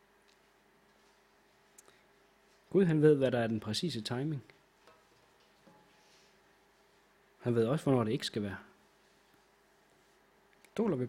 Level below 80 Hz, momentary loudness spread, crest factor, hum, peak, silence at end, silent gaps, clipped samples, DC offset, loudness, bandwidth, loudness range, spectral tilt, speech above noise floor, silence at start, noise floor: -72 dBFS; 15 LU; 24 dB; 50 Hz at -55 dBFS; -12 dBFS; 0 s; none; under 0.1%; under 0.1%; -32 LUFS; 15.5 kHz; 9 LU; -6.5 dB/octave; 37 dB; 2.7 s; -67 dBFS